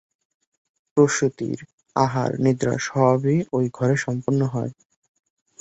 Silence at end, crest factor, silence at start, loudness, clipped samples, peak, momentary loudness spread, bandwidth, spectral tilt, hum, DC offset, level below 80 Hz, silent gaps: 0.9 s; 20 dB; 0.95 s; -22 LUFS; under 0.1%; -4 dBFS; 10 LU; 8.2 kHz; -6.5 dB/octave; none; under 0.1%; -60 dBFS; 1.73-1.78 s